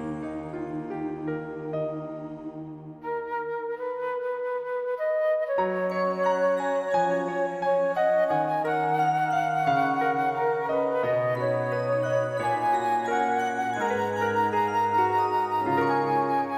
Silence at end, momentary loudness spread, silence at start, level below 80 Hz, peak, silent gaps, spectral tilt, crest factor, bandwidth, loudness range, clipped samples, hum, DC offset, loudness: 0 s; 10 LU; 0 s; -66 dBFS; -12 dBFS; none; -6.5 dB/octave; 14 dB; 14 kHz; 8 LU; under 0.1%; none; under 0.1%; -26 LUFS